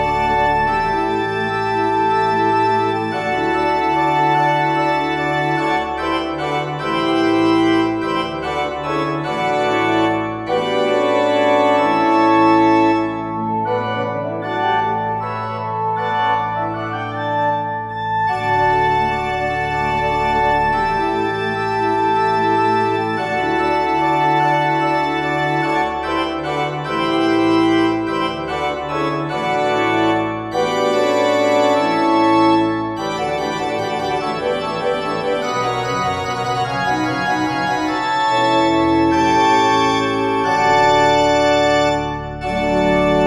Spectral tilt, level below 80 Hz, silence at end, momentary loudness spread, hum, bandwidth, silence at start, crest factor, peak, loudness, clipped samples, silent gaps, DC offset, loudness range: -5.5 dB/octave; -42 dBFS; 0 s; 7 LU; none; 12.5 kHz; 0 s; 14 dB; -2 dBFS; -17 LUFS; under 0.1%; none; under 0.1%; 5 LU